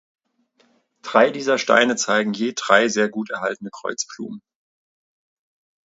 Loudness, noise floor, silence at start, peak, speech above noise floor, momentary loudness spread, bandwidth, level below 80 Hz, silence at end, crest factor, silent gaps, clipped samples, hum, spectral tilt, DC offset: -20 LUFS; -63 dBFS; 1.05 s; 0 dBFS; 43 dB; 15 LU; 8 kHz; -72 dBFS; 1.45 s; 22 dB; none; under 0.1%; none; -3 dB/octave; under 0.1%